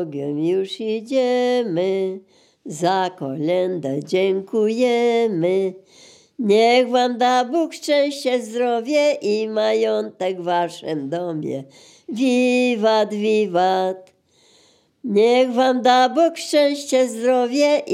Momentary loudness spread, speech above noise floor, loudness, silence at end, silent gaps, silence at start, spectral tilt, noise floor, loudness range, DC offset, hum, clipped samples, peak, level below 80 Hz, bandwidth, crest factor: 10 LU; 38 dB; -19 LUFS; 0 s; none; 0 s; -5 dB/octave; -57 dBFS; 4 LU; under 0.1%; none; under 0.1%; -2 dBFS; -80 dBFS; 14.5 kHz; 16 dB